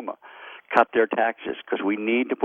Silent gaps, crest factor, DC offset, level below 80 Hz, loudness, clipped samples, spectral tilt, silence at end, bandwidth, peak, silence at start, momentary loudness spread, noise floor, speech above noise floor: none; 20 dB; under 0.1%; -70 dBFS; -23 LUFS; under 0.1%; -6.5 dB/octave; 0 s; 7.2 kHz; -4 dBFS; 0 s; 19 LU; -44 dBFS; 21 dB